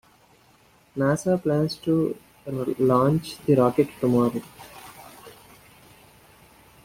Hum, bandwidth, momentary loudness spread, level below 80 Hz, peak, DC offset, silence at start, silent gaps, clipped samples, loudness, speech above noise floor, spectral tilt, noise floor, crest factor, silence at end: none; 16.5 kHz; 23 LU; -58 dBFS; -6 dBFS; under 0.1%; 0.95 s; none; under 0.1%; -23 LUFS; 35 dB; -7 dB/octave; -58 dBFS; 18 dB; 1.55 s